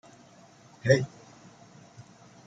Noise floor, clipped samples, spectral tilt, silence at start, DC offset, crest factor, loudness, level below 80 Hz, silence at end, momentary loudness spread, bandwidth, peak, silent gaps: -55 dBFS; under 0.1%; -6 dB/octave; 0.85 s; under 0.1%; 26 dB; -27 LUFS; -70 dBFS; 1.4 s; 27 LU; 9.2 kHz; -8 dBFS; none